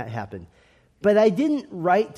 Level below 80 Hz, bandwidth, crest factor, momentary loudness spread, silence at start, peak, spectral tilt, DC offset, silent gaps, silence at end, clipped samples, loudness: -62 dBFS; 12.5 kHz; 16 dB; 18 LU; 0 s; -6 dBFS; -7 dB/octave; under 0.1%; none; 0 s; under 0.1%; -21 LUFS